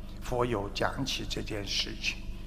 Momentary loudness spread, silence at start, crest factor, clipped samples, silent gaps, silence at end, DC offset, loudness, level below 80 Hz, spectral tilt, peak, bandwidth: 5 LU; 0 s; 22 dB; under 0.1%; none; 0 s; under 0.1%; -32 LUFS; -40 dBFS; -4 dB/octave; -12 dBFS; 15.5 kHz